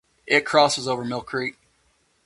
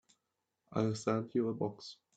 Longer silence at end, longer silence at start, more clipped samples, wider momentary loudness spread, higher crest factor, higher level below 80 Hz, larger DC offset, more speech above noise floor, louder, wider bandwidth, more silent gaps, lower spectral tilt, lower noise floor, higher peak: first, 0.75 s vs 0.2 s; second, 0.25 s vs 0.7 s; neither; first, 10 LU vs 7 LU; about the same, 22 dB vs 20 dB; first, -62 dBFS vs -76 dBFS; neither; second, 43 dB vs 51 dB; first, -22 LUFS vs -36 LUFS; first, 11.5 kHz vs 9 kHz; neither; second, -3 dB/octave vs -6.5 dB/octave; second, -65 dBFS vs -86 dBFS; first, -2 dBFS vs -18 dBFS